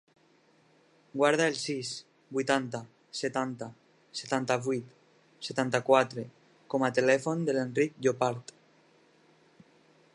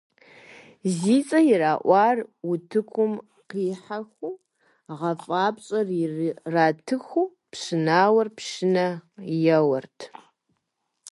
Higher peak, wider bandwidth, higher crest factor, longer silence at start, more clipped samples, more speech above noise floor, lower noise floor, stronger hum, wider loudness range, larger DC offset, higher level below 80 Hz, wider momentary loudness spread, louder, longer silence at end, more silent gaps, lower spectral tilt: about the same, -8 dBFS vs -6 dBFS; about the same, 11.5 kHz vs 11.5 kHz; about the same, 22 dB vs 18 dB; first, 1.15 s vs 0.85 s; neither; second, 36 dB vs 54 dB; second, -65 dBFS vs -78 dBFS; neither; about the same, 5 LU vs 6 LU; neither; about the same, -80 dBFS vs -76 dBFS; about the same, 16 LU vs 17 LU; second, -30 LUFS vs -23 LUFS; first, 1.75 s vs 0 s; neither; second, -4.5 dB/octave vs -6 dB/octave